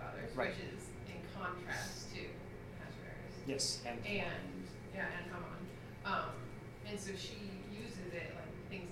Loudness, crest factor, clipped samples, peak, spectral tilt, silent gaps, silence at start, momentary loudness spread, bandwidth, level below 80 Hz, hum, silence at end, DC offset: -44 LUFS; 20 dB; under 0.1%; -24 dBFS; -4 dB/octave; none; 0 s; 10 LU; 16 kHz; -60 dBFS; none; 0 s; under 0.1%